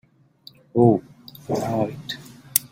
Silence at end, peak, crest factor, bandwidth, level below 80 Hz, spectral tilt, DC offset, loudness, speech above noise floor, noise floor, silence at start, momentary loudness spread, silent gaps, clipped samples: 0.05 s; 0 dBFS; 24 dB; 16.5 kHz; -58 dBFS; -5.5 dB/octave; under 0.1%; -23 LUFS; 31 dB; -51 dBFS; 0.75 s; 18 LU; none; under 0.1%